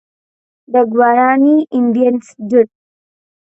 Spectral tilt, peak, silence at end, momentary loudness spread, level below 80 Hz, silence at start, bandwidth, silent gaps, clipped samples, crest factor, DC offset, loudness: -7.5 dB/octave; 0 dBFS; 0.85 s; 6 LU; -68 dBFS; 0.7 s; 8.2 kHz; none; under 0.1%; 14 dB; under 0.1%; -13 LUFS